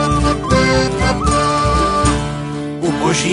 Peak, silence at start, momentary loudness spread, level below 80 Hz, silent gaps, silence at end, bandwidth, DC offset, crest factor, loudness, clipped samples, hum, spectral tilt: 0 dBFS; 0 s; 7 LU; -24 dBFS; none; 0 s; 11 kHz; under 0.1%; 14 dB; -15 LUFS; under 0.1%; none; -5 dB/octave